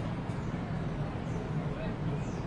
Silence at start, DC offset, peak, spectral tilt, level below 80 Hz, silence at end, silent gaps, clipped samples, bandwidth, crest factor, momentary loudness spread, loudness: 0 s; under 0.1%; -24 dBFS; -8 dB/octave; -46 dBFS; 0 s; none; under 0.1%; 10.5 kHz; 12 dB; 1 LU; -36 LUFS